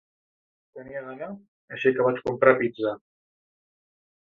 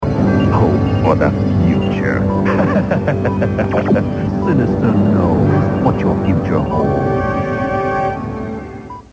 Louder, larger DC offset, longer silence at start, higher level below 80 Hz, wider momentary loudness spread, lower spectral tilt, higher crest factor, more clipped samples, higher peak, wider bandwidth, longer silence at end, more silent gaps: second, -23 LUFS vs -15 LUFS; neither; first, 0.75 s vs 0 s; second, -66 dBFS vs -30 dBFS; first, 20 LU vs 5 LU; about the same, -8 dB/octave vs -9 dB/octave; first, 24 dB vs 14 dB; neither; second, -4 dBFS vs 0 dBFS; second, 6.6 kHz vs 8 kHz; first, 1.35 s vs 0.1 s; first, 1.48-1.68 s vs none